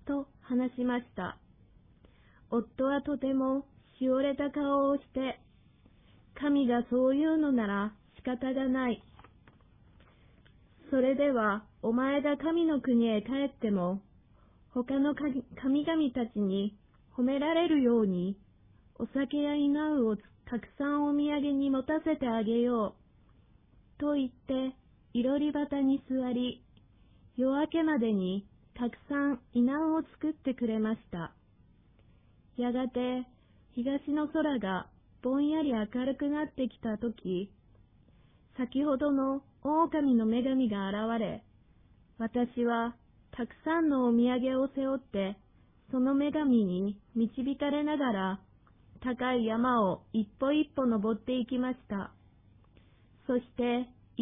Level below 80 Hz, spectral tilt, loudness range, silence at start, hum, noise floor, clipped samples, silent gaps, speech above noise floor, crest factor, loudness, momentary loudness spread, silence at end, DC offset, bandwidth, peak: -62 dBFS; -10 dB/octave; 4 LU; 0.05 s; none; -63 dBFS; under 0.1%; none; 33 dB; 16 dB; -31 LUFS; 11 LU; 0 s; under 0.1%; 3.8 kHz; -16 dBFS